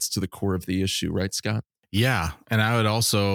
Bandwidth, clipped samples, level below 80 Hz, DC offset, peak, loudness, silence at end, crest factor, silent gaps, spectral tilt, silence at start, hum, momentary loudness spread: 19 kHz; under 0.1%; -46 dBFS; under 0.1%; -6 dBFS; -25 LUFS; 0 s; 18 dB; none; -4.5 dB/octave; 0 s; none; 7 LU